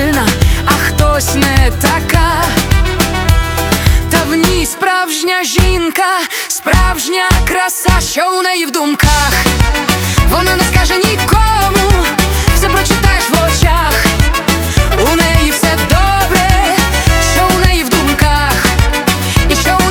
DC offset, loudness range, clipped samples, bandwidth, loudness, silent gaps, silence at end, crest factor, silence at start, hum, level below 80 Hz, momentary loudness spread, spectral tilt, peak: under 0.1%; 2 LU; 0.2%; 20 kHz; -11 LUFS; none; 0 s; 10 dB; 0 s; none; -16 dBFS; 3 LU; -4 dB/octave; 0 dBFS